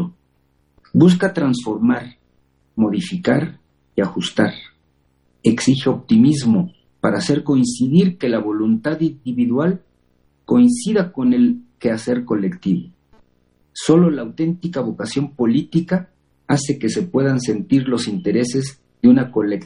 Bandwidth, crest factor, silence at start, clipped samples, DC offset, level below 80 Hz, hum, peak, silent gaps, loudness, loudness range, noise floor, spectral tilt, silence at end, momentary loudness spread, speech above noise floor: 11.5 kHz; 18 dB; 0 s; under 0.1%; under 0.1%; -56 dBFS; none; 0 dBFS; none; -18 LUFS; 4 LU; -62 dBFS; -6.5 dB/octave; 0 s; 9 LU; 45 dB